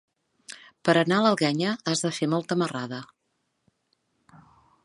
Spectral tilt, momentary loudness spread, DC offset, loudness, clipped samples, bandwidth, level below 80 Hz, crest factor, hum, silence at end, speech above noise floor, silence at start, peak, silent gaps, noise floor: -5 dB/octave; 19 LU; under 0.1%; -25 LUFS; under 0.1%; 11.5 kHz; -74 dBFS; 22 dB; none; 1.8 s; 52 dB; 0.5 s; -4 dBFS; none; -76 dBFS